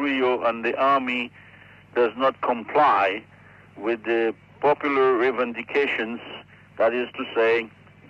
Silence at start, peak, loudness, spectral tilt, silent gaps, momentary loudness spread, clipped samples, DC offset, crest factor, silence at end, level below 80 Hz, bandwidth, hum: 0 s; -10 dBFS; -23 LUFS; -6 dB/octave; none; 11 LU; under 0.1%; under 0.1%; 14 dB; 0.4 s; -68 dBFS; 7.6 kHz; none